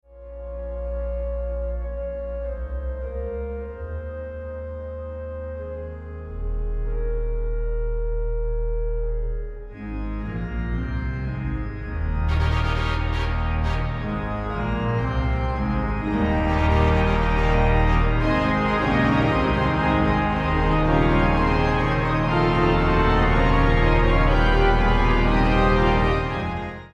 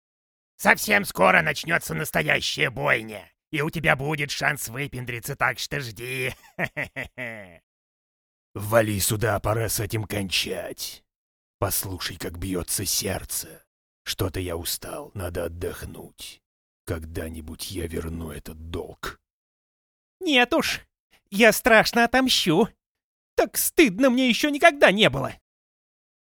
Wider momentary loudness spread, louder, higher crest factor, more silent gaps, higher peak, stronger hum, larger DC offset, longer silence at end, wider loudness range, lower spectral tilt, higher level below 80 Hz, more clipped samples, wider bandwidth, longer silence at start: second, 14 LU vs 17 LU; about the same, -23 LUFS vs -23 LUFS; second, 16 dB vs 26 dB; second, none vs 7.63-8.54 s, 11.16-11.59 s, 13.67-14.05 s, 16.46-16.85 s, 19.33-20.20 s, 21.00-21.10 s, 22.88-22.95 s, 23.04-23.37 s; second, -6 dBFS vs 0 dBFS; neither; neither; second, 0.05 s vs 0.9 s; about the same, 12 LU vs 13 LU; first, -8 dB/octave vs -3.5 dB/octave; first, -26 dBFS vs -48 dBFS; neither; second, 7 kHz vs over 20 kHz; second, 0.1 s vs 0.6 s